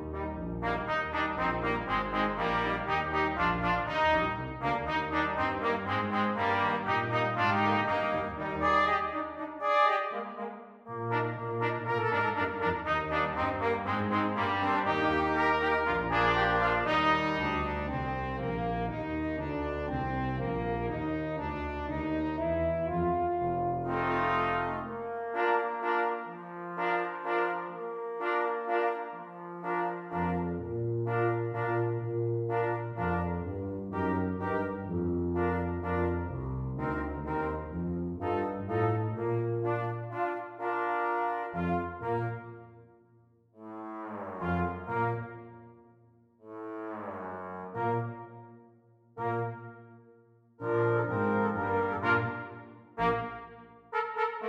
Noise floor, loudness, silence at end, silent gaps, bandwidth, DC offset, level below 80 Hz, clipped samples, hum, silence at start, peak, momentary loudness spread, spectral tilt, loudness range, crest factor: -63 dBFS; -31 LUFS; 0 s; none; 8.2 kHz; under 0.1%; -50 dBFS; under 0.1%; none; 0 s; -12 dBFS; 12 LU; -7.5 dB/octave; 9 LU; 18 dB